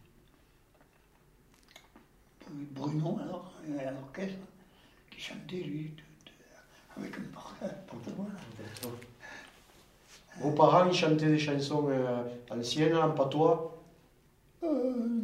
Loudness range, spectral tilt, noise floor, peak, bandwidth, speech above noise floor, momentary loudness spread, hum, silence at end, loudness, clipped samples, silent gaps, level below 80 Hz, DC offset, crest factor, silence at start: 16 LU; -6 dB/octave; -64 dBFS; -10 dBFS; 15.5 kHz; 33 dB; 21 LU; none; 0 s; -31 LUFS; under 0.1%; none; -68 dBFS; under 0.1%; 24 dB; 1.95 s